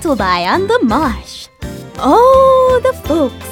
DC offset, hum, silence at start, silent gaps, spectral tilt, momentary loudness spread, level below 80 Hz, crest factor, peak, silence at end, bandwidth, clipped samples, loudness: under 0.1%; none; 0 s; none; -5.5 dB/octave; 20 LU; -32 dBFS; 12 dB; 0 dBFS; 0 s; 17 kHz; under 0.1%; -11 LUFS